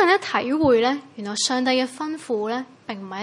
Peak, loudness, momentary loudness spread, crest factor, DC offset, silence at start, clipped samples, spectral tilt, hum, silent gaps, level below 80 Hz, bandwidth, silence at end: -6 dBFS; -22 LUFS; 13 LU; 16 dB; under 0.1%; 0 s; under 0.1%; -3 dB/octave; none; none; -60 dBFS; 11.5 kHz; 0 s